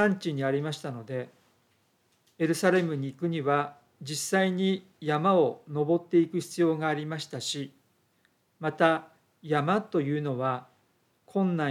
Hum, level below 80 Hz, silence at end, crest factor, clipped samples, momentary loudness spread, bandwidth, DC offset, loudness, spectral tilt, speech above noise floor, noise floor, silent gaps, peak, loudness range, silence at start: none; -82 dBFS; 0 s; 20 dB; under 0.1%; 11 LU; 15.5 kHz; under 0.1%; -28 LUFS; -5.5 dB/octave; 42 dB; -69 dBFS; none; -10 dBFS; 3 LU; 0 s